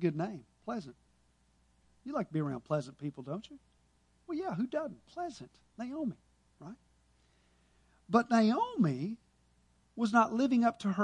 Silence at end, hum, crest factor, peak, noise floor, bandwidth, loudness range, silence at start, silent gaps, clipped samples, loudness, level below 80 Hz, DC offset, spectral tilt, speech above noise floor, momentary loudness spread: 0 s; none; 20 dB; -14 dBFS; -70 dBFS; 10 kHz; 10 LU; 0 s; none; under 0.1%; -34 LUFS; -72 dBFS; under 0.1%; -7 dB/octave; 37 dB; 23 LU